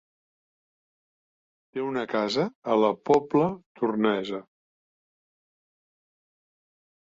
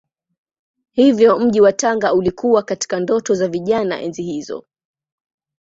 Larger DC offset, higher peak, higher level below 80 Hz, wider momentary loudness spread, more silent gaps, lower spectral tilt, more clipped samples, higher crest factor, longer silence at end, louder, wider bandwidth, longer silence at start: neither; second, -8 dBFS vs -2 dBFS; second, -68 dBFS vs -56 dBFS; about the same, 11 LU vs 13 LU; first, 2.55-2.62 s, 3.66-3.75 s vs none; first, -6.5 dB/octave vs -5 dB/octave; neither; about the same, 20 dB vs 16 dB; first, 2.6 s vs 1.05 s; second, -26 LUFS vs -16 LUFS; about the same, 7.8 kHz vs 8 kHz; first, 1.75 s vs 0.95 s